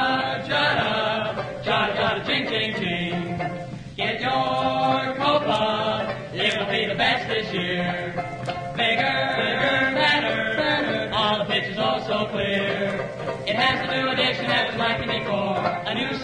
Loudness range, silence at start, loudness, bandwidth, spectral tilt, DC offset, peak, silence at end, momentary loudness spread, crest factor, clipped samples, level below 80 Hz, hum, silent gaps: 3 LU; 0 s; -23 LUFS; 10.5 kHz; -5 dB/octave; under 0.1%; -6 dBFS; 0 s; 8 LU; 18 dB; under 0.1%; -52 dBFS; none; none